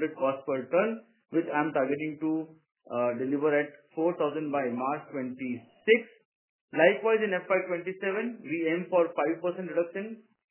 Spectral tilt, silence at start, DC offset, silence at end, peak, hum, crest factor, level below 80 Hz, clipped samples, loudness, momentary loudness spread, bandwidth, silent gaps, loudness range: -9.5 dB/octave; 0 s; under 0.1%; 0.3 s; -8 dBFS; none; 22 dB; -84 dBFS; under 0.1%; -29 LUFS; 11 LU; 3.2 kHz; 6.25-6.68 s; 3 LU